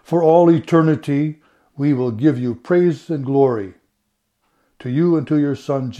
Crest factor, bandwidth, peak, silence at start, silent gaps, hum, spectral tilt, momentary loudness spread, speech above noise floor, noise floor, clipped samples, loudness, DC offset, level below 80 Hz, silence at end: 16 dB; 9.6 kHz; 0 dBFS; 0.1 s; none; none; -9 dB/octave; 11 LU; 54 dB; -71 dBFS; under 0.1%; -17 LUFS; under 0.1%; -64 dBFS; 0 s